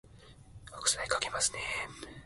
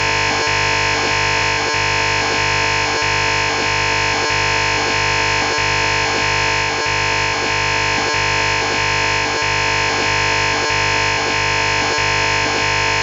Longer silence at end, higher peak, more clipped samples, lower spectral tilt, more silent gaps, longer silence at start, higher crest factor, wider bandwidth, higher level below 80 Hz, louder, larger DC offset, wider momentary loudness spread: about the same, 0 s vs 0 s; second, -12 dBFS vs -6 dBFS; neither; second, 0 dB/octave vs -2.5 dB/octave; neither; about the same, 0.05 s vs 0 s; first, 24 dB vs 12 dB; about the same, 12 kHz vs 11.5 kHz; second, -58 dBFS vs -36 dBFS; second, -32 LUFS vs -15 LUFS; neither; first, 16 LU vs 1 LU